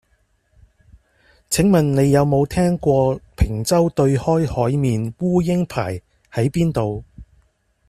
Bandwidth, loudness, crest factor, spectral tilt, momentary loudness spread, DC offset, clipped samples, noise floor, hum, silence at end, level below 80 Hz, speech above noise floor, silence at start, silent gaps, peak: 14.5 kHz; -19 LUFS; 16 dB; -6.5 dB/octave; 9 LU; under 0.1%; under 0.1%; -63 dBFS; none; 0.65 s; -36 dBFS; 45 dB; 1.5 s; none; -4 dBFS